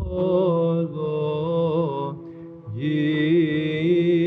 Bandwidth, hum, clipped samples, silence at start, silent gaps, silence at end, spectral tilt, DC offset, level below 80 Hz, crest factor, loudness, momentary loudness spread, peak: 4.9 kHz; none; under 0.1%; 0 s; none; 0 s; -9.5 dB/octave; under 0.1%; -46 dBFS; 12 dB; -22 LUFS; 13 LU; -10 dBFS